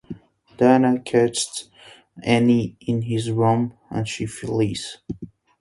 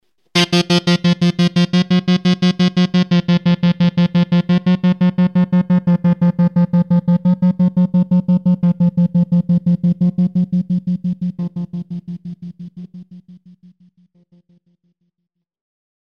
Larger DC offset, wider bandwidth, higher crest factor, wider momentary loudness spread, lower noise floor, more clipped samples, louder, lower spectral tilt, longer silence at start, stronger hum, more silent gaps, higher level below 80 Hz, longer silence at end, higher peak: second, under 0.1% vs 0.2%; first, 11.5 kHz vs 8.6 kHz; first, 20 dB vs 14 dB; first, 18 LU vs 12 LU; second, -40 dBFS vs -76 dBFS; neither; second, -21 LUFS vs -15 LUFS; second, -5.5 dB/octave vs -7 dB/octave; second, 0.1 s vs 0.35 s; neither; neither; about the same, -54 dBFS vs -52 dBFS; second, 0.35 s vs 2.8 s; about the same, -2 dBFS vs 0 dBFS